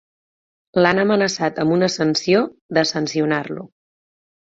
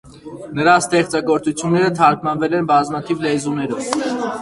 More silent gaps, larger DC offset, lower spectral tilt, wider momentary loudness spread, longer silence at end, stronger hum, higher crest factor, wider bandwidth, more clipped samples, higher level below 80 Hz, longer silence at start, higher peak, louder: first, 2.61-2.69 s vs none; neither; about the same, -5 dB/octave vs -5 dB/octave; about the same, 7 LU vs 8 LU; first, 0.95 s vs 0 s; neither; about the same, 18 dB vs 18 dB; second, 8 kHz vs 11.5 kHz; neither; second, -60 dBFS vs -54 dBFS; first, 0.75 s vs 0.05 s; about the same, -2 dBFS vs 0 dBFS; about the same, -19 LUFS vs -17 LUFS